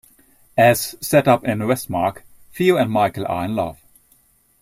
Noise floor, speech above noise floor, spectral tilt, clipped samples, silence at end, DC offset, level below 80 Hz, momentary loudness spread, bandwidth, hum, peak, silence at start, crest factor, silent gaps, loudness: -57 dBFS; 40 dB; -5.5 dB/octave; under 0.1%; 0.9 s; under 0.1%; -54 dBFS; 9 LU; 16 kHz; none; -2 dBFS; 0.55 s; 18 dB; none; -19 LUFS